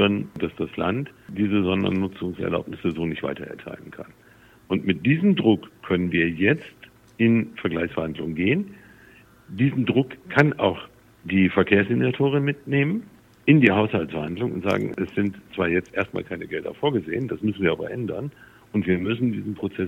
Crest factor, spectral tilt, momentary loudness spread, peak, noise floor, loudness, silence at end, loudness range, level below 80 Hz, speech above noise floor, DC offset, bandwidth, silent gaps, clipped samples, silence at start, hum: 22 dB; -8 dB/octave; 12 LU; -2 dBFS; -51 dBFS; -23 LUFS; 0 s; 5 LU; -56 dBFS; 28 dB; under 0.1%; 8.6 kHz; none; under 0.1%; 0 s; none